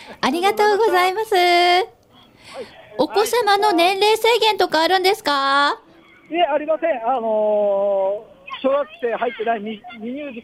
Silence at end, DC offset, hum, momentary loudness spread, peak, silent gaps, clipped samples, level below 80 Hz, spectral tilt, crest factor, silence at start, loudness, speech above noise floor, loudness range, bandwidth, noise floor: 0 s; under 0.1%; none; 15 LU; -4 dBFS; none; under 0.1%; -62 dBFS; -2.5 dB/octave; 14 dB; 0 s; -18 LUFS; 32 dB; 4 LU; 16 kHz; -50 dBFS